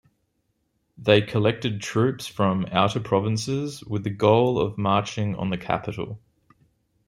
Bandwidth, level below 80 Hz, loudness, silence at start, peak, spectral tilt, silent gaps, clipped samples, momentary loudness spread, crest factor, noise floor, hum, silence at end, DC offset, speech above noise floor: 12.5 kHz; -56 dBFS; -24 LUFS; 1 s; -4 dBFS; -6 dB/octave; none; under 0.1%; 10 LU; 22 dB; -73 dBFS; none; 0.9 s; under 0.1%; 50 dB